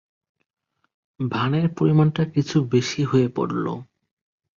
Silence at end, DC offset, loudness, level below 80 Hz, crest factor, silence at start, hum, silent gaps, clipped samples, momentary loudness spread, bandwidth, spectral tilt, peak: 0.75 s; under 0.1%; -22 LUFS; -58 dBFS; 16 dB; 1.2 s; none; none; under 0.1%; 9 LU; 7.4 kHz; -7 dB/octave; -6 dBFS